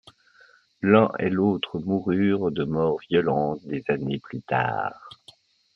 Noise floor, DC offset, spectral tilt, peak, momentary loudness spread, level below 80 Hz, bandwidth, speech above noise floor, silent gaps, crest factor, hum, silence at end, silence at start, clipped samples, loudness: -57 dBFS; under 0.1%; -9 dB/octave; -4 dBFS; 11 LU; -60 dBFS; 5.8 kHz; 33 dB; none; 22 dB; none; 0.65 s; 0.8 s; under 0.1%; -24 LUFS